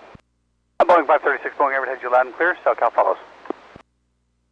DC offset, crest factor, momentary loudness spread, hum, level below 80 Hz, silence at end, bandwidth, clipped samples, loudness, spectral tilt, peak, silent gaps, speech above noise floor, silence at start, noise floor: under 0.1%; 14 dB; 19 LU; 60 Hz at -65 dBFS; -64 dBFS; 1.05 s; 7.6 kHz; under 0.1%; -19 LUFS; -5 dB/octave; -6 dBFS; none; 49 dB; 0.8 s; -68 dBFS